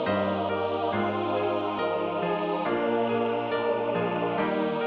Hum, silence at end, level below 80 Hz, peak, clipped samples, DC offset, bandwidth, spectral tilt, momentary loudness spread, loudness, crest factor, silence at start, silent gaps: none; 0 s; -66 dBFS; -14 dBFS; under 0.1%; under 0.1%; 5.8 kHz; -8.5 dB/octave; 2 LU; -27 LUFS; 12 dB; 0 s; none